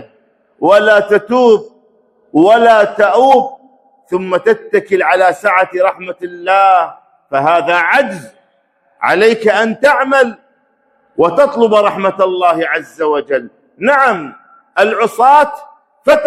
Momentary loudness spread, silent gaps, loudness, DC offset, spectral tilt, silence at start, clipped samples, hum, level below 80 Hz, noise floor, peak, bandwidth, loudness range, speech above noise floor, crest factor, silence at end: 11 LU; none; -11 LUFS; under 0.1%; -5 dB/octave; 0 s; 0.3%; none; -58 dBFS; -57 dBFS; 0 dBFS; 14 kHz; 3 LU; 46 dB; 12 dB; 0 s